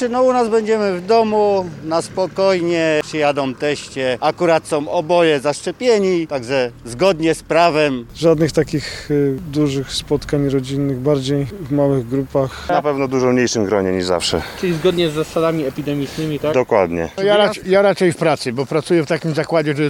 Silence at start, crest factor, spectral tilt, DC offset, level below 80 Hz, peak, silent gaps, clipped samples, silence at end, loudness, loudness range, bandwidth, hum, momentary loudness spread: 0 s; 16 dB; -5.5 dB/octave; under 0.1%; -44 dBFS; -2 dBFS; none; under 0.1%; 0 s; -17 LUFS; 2 LU; 17.5 kHz; none; 7 LU